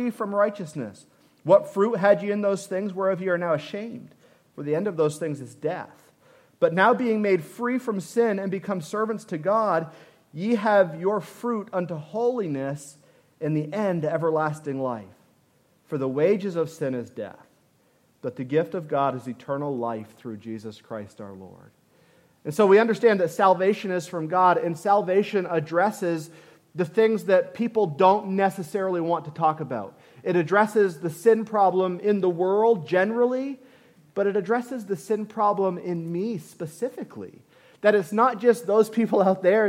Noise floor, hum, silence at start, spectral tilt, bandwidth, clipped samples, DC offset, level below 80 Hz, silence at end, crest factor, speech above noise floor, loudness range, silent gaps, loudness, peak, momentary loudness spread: -63 dBFS; none; 0 s; -6.5 dB/octave; 16 kHz; under 0.1%; under 0.1%; -78 dBFS; 0 s; 20 dB; 40 dB; 7 LU; none; -24 LUFS; -4 dBFS; 16 LU